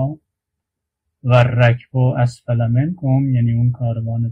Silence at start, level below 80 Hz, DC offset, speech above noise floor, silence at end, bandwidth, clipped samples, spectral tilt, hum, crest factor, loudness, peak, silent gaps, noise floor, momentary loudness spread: 0 s; -46 dBFS; under 0.1%; 65 dB; 0 s; 7.4 kHz; under 0.1%; -8.5 dB/octave; none; 16 dB; -17 LUFS; -2 dBFS; none; -81 dBFS; 8 LU